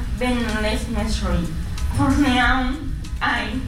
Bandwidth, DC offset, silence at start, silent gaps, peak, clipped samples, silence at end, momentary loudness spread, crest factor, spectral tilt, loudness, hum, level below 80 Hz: 15.5 kHz; under 0.1%; 0 s; none; -8 dBFS; under 0.1%; 0 s; 10 LU; 14 dB; -5.5 dB/octave; -21 LUFS; none; -26 dBFS